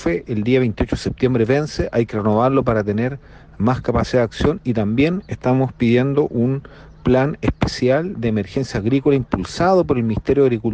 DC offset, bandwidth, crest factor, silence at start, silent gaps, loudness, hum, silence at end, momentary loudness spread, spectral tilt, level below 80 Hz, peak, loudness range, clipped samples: under 0.1%; 9 kHz; 14 dB; 0 s; none; -19 LUFS; none; 0 s; 6 LU; -7.5 dB/octave; -36 dBFS; -4 dBFS; 1 LU; under 0.1%